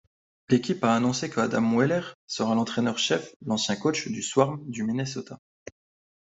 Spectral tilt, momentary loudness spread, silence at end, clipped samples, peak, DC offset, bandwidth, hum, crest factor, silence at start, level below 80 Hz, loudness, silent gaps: -4.5 dB/octave; 8 LU; 0.9 s; under 0.1%; -6 dBFS; under 0.1%; 8 kHz; none; 22 dB; 0.5 s; -66 dBFS; -26 LUFS; 2.14-2.28 s, 3.36-3.40 s